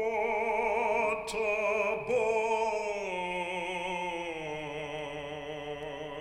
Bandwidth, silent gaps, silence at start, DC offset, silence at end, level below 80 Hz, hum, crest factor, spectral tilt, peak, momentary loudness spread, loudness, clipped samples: 13 kHz; none; 0 s; under 0.1%; 0 s; -60 dBFS; none; 14 dB; -4 dB/octave; -18 dBFS; 10 LU; -32 LUFS; under 0.1%